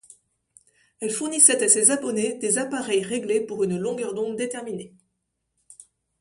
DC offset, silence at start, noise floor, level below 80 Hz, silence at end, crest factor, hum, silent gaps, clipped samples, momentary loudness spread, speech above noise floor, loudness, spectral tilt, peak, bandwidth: under 0.1%; 1 s; -77 dBFS; -70 dBFS; 0.5 s; 24 dB; none; none; under 0.1%; 14 LU; 54 dB; -21 LUFS; -2.5 dB/octave; -2 dBFS; 11.5 kHz